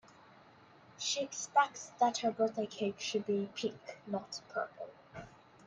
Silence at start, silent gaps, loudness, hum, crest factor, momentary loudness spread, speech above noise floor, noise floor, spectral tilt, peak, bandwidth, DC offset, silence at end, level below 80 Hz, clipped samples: 1 s; none; -36 LUFS; none; 22 dB; 18 LU; 25 dB; -61 dBFS; -3 dB/octave; -16 dBFS; 10 kHz; under 0.1%; 0.35 s; -78 dBFS; under 0.1%